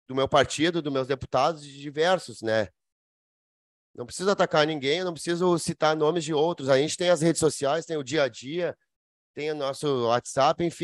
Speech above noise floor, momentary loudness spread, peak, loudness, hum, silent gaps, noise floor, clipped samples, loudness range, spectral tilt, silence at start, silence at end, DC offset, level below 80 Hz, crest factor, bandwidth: over 65 dB; 8 LU; -6 dBFS; -25 LUFS; none; 2.92-3.94 s, 8.96-9.34 s; under -90 dBFS; under 0.1%; 4 LU; -4.5 dB/octave; 0.1 s; 0 s; under 0.1%; -60 dBFS; 20 dB; 12.5 kHz